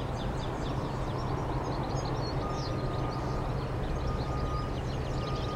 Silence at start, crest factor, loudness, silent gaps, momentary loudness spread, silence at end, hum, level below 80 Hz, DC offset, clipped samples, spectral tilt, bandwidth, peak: 0 s; 12 dB; -34 LUFS; none; 1 LU; 0 s; none; -38 dBFS; under 0.1%; under 0.1%; -6.5 dB/octave; 12 kHz; -20 dBFS